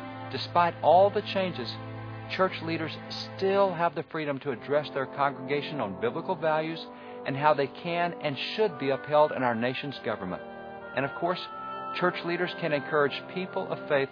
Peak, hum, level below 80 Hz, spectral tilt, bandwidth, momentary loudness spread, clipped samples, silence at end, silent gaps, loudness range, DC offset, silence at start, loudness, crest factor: -8 dBFS; none; -68 dBFS; -7 dB/octave; 5.4 kHz; 12 LU; under 0.1%; 0 s; none; 3 LU; under 0.1%; 0 s; -29 LUFS; 20 dB